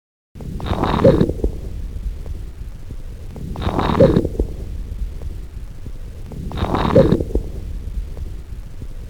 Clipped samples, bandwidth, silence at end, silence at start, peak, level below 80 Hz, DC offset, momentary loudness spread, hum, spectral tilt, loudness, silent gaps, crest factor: under 0.1%; 18 kHz; 0 s; 0.35 s; 0 dBFS; -26 dBFS; 1%; 21 LU; none; -8 dB/octave; -20 LUFS; none; 20 dB